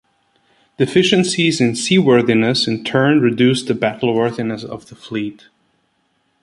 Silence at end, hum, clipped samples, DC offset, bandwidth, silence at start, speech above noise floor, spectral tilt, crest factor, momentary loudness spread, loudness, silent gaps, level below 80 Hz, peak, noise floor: 1.1 s; none; under 0.1%; under 0.1%; 11.5 kHz; 0.8 s; 49 dB; -5 dB/octave; 16 dB; 13 LU; -16 LUFS; none; -56 dBFS; -2 dBFS; -64 dBFS